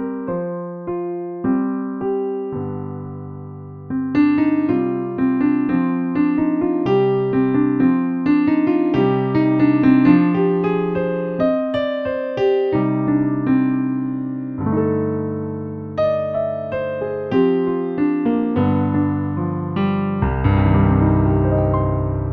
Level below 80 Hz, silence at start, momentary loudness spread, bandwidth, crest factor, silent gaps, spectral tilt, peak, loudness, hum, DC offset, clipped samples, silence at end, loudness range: -36 dBFS; 0 s; 10 LU; 5.2 kHz; 16 dB; none; -10.5 dB/octave; -2 dBFS; -19 LUFS; none; under 0.1%; under 0.1%; 0 s; 6 LU